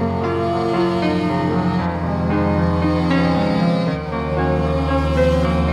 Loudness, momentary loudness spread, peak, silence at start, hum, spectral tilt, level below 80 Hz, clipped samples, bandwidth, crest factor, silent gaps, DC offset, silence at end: -19 LUFS; 4 LU; -4 dBFS; 0 s; none; -8 dB/octave; -30 dBFS; under 0.1%; 10 kHz; 12 dB; none; under 0.1%; 0 s